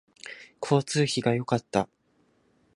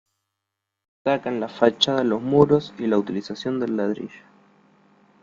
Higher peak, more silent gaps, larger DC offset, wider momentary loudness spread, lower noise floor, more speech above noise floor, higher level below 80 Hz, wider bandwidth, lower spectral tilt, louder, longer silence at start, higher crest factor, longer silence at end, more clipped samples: second, -8 dBFS vs -2 dBFS; neither; neither; first, 18 LU vs 11 LU; second, -67 dBFS vs -83 dBFS; second, 41 dB vs 61 dB; about the same, -64 dBFS vs -60 dBFS; first, 11.5 kHz vs 7.6 kHz; about the same, -5.5 dB/octave vs -6 dB/octave; second, -27 LUFS vs -22 LUFS; second, 0.25 s vs 1.05 s; about the same, 22 dB vs 22 dB; second, 0.9 s vs 1.05 s; neither